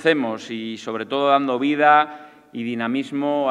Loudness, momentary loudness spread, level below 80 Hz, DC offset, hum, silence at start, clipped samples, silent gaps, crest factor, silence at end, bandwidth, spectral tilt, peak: -21 LUFS; 14 LU; -78 dBFS; under 0.1%; none; 0 s; under 0.1%; none; 18 dB; 0 s; 10 kHz; -5.5 dB/octave; -2 dBFS